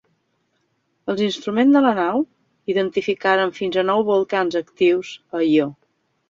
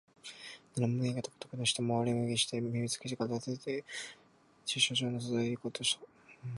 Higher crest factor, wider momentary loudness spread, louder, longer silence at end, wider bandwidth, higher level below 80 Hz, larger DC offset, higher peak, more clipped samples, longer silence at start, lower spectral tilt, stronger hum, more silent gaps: about the same, 16 dB vs 20 dB; second, 11 LU vs 14 LU; first, -20 LUFS vs -34 LUFS; first, 0.55 s vs 0 s; second, 7.6 kHz vs 11.5 kHz; first, -66 dBFS vs -72 dBFS; neither; first, -4 dBFS vs -14 dBFS; neither; first, 1.05 s vs 0.25 s; first, -6 dB/octave vs -4 dB/octave; neither; neither